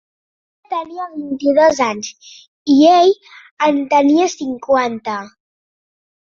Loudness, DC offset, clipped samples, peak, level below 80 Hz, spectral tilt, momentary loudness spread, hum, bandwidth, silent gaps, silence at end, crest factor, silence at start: -15 LUFS; under 0.1%; under 0.1%; -2 dBFS; -60 dBFS; -4 dB/octave; 16 LU; none; 7.4 kHz; 2.48-2.66 s, 3.51-3.57 s; 0.95 s; 14 dB; 0.7 s